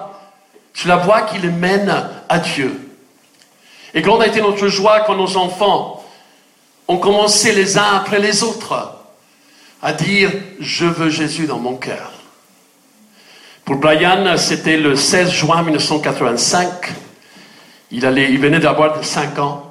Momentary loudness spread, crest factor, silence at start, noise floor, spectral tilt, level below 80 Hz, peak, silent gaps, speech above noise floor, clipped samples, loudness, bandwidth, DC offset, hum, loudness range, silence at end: 13 LU; 16 dB; 0 s; -52 dBFS; -3.5 dB/octave; -54 dBFS; 0 dBFS; none; 37 dB; under 0.1%; -14 LUFS; 15.5 kHz; under 0.1%; none; 4 LU; 0 s